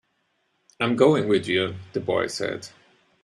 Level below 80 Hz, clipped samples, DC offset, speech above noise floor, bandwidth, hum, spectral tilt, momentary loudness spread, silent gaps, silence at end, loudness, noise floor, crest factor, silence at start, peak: -64 dBFS; under 0.1%; under 0.1%; 48 dB; 12 kHz; none; -5.5 dB/octave; 12 LU; none; 0.55 s; -23 LUFS; -71 dBFS; 22 dB; 0.8 s; -4 dBFS